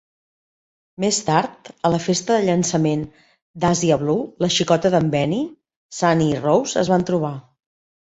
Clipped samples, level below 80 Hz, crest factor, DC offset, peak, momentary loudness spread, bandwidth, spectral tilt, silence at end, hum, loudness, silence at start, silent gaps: under 0.1%; -54 dBFS; 18 dB; under 0.1%; -2 dBFS; 9 LU; 8.4 kHz; -5 dB/octave; 0.7 s; none; -19 LUFS; 1 s; 3.42-3.54 s, 5.77-5.89 s